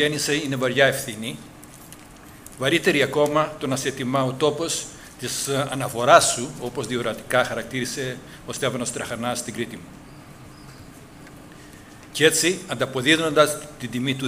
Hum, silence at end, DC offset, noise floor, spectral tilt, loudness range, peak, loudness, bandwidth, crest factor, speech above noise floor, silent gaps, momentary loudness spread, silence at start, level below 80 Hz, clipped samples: none; 0 s; under 0.1%; -44 dBFS; -3.5 dB/octave; 9 LU; 0 dBFS; -22 LUFS; 16 kHz; 24 dB; 22 dB; none; 25 LU; 0 s; -54 dBFS; under 0.1%